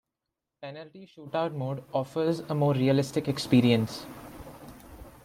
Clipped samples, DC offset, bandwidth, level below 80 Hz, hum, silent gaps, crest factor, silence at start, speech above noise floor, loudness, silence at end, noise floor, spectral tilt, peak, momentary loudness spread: under 0.1%; under 0.1%; 16.5 kHz; -58 dBFS; none; none; 20 dB; 0.6 s; 59 dB; -27 LUFS; 0.15 s; -86 dBFS; -7 dB/octave; -10 dBFS; 24 LU